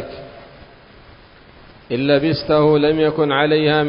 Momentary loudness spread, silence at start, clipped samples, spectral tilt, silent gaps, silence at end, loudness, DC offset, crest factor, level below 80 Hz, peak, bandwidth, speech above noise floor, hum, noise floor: 18 LU; 0 s; under 0.1%; -11 dB/octave; none; 0 s; -16 LUFS; under 0.1%; 16 dB; -48 dBFS; -2 dBFS; 5.4 kHz; 29 dB; none; -45 dBFS